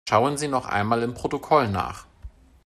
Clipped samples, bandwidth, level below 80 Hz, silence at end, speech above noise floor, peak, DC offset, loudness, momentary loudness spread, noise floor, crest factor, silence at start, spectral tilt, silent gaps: under 0.1%; 13.5 kHz; -50 dBFS; 0.4 s; 22 dB; -4 dBFS; under 0.1%; -24 LUFS; 9 LU; -45 dBFS; 20 dB; 0.05 s; -5.5 dB/octave; none